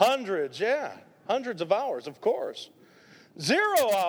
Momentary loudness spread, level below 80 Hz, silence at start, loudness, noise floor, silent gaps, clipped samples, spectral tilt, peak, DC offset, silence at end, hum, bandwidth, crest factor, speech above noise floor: 15 LU; -76 dBFS; 0 s; -28 LUFS; -55 dBFS; none; under 0.1%; -3.5 dB/octave; -8 dBFS; under 0.1%; 0 s; none; over 20 kHz; 20 dB; 29 dB